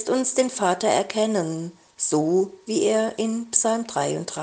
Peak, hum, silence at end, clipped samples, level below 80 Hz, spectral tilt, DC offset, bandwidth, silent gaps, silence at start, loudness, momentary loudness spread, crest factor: -2 dBFS; none; 0 s; under 0.1%; -68 dBFS; -3.5 dB/octave; under 0.1%; 10 kHz; none; 0 s; -23 LUFS; 6 LU; 22 dB